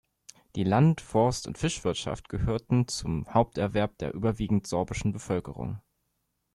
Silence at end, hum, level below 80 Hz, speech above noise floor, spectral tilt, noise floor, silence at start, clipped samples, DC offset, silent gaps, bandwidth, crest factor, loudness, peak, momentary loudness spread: 0.75 s; none; -46 dBFS; 50 dB; -6 dB/octave; -78 dBFS; 0.55 s; under 0.1%; under 0.1%; none; 12.5 kHz; 18 dB; -28 LUFS; -10 dBFS; 10 LU